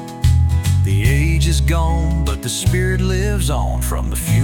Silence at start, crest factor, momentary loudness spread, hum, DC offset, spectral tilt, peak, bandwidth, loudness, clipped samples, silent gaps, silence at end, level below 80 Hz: 0 s; 12 dB; 5 LU; none; under 0.1%; -5.5 dB/octave; -4 dBFS; 17.5 kHz; -17 LUFS; under 0.1%; none; 0 s; -20 dBFS